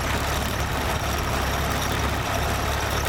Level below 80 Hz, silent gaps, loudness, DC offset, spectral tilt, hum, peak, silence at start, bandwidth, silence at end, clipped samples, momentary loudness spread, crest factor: -32 dBFS; none; -25 LUFS; under 0.1%; -4 dB/octave; none; -10 dBFS; 0 s; 18.5 kHz; 0 s; under 0.1%; 1 LU; 14 dB